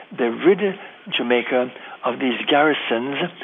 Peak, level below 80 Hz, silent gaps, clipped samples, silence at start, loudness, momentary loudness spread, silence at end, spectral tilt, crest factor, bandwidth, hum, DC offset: -4 dBFS; -78 dBFS; none; under 0.1%; 0 s; -20 LUFS; 9 LU; 0 s; -7.5 dB/octave; 18 dB; 3.9 kHz; none; under 0.1%